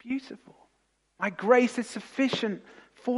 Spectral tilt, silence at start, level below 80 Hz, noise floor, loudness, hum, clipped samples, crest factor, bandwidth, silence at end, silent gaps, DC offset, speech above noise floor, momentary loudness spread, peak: -5 dB/octave; 0.05 s; -76 dBFS; -72 dBFS; -28 LUFS; none; under 0.1%; 22 dB; 11.5 kHz; 0 s; none; under 0.1%; 44 dB; 18 LU; -8 dBFS